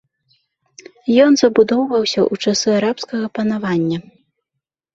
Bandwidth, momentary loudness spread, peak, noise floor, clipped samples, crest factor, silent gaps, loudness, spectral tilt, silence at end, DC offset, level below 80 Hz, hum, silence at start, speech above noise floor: 8 kHz; 11 LU; -2 dBFS; -80 dBFS; under 0.1%; 16 dB; none; -16 LUFS; -4.5 dB/octave; 0.95 s; under 0.1%; -60 dBFS; none; 1.05 s; 64 dB